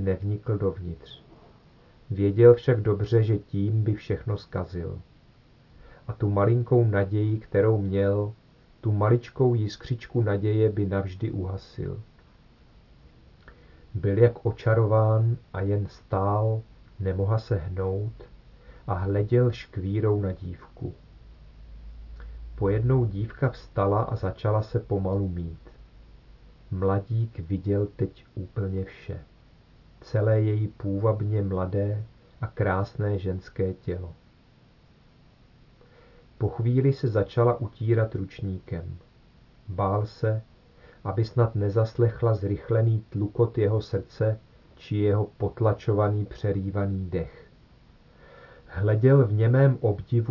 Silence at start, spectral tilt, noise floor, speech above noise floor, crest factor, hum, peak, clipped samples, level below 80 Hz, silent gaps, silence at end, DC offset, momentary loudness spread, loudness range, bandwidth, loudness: 0 s; -10 dB/octave; -57 dBFS; 32 dB; 22 dB; none; -4 dBFS; under 0.1%; -50 dBFS; none; 0 s; under 0.1%; 15 LU; 6 LU; 6 kHz; -26 LUFS